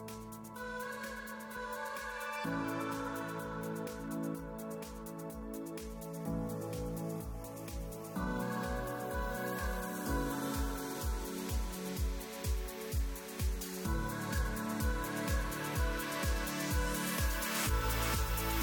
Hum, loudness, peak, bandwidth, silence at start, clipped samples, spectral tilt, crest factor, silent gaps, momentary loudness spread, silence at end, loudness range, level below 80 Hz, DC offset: none; -38 LUFS; -22 dBFS; 17 kHz; 0 s; under 0.1%; -4.5 dB/octave; 16 dB; none; 10 LU; 0 s; 7 LU; -42 dBFS; under 0.1%